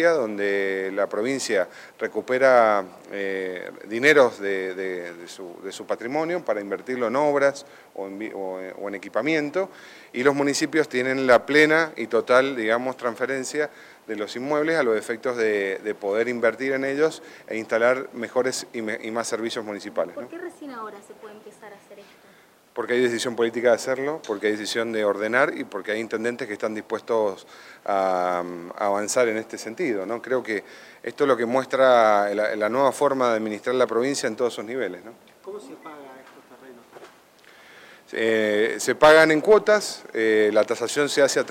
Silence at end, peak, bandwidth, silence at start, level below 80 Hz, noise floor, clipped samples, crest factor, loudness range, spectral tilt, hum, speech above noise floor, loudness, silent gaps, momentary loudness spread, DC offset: 0 s; -6 dBFS; 16 kHz; 0 s; -68 dBFS; -54 dBFS; under 0.1%; 18 dB; 9 LU; -3.5 dB/octave; none; 31 dB; -23 LUFS; none; 18 LU; under 0.1%